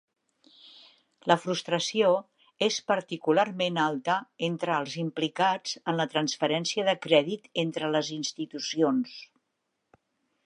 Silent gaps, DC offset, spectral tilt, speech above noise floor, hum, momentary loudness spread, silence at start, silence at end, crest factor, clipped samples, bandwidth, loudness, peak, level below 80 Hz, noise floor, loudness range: none; under 0.1%; -4 dB/octave; 53 dB; none; 8 LU; 0.65 s; 1.25 s; 24 dB; under 0.1%; 11 kHz; -28 LUFS; -4 dBFS; -80 dBFS; -80 dBFS; 2 LU